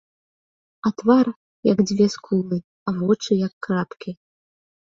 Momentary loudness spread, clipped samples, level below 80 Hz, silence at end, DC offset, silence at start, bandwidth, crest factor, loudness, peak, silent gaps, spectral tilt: 12 LU; under 0.1%; -62 dBFS; 0.7 s; under 0.1%; 0.85 s; 7.6 kHz; 18 dB; -22 LUFS; -4 dBFS; 1.36-1.63 s, 2.64-2.86 s, 3.53-3.61 s; -6.5 dB/octave